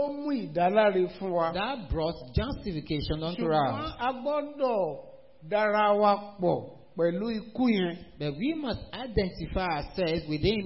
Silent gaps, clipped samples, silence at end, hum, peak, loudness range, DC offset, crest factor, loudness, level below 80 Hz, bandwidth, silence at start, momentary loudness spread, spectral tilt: none; under 0.1%; 0 s; none; -12 dBFS; 3 LU; 0.2%; 18 dB; -29 LUFS; -44 dBFS; 5.8 kHz; 0 s; 10 LU; -10 dB/octave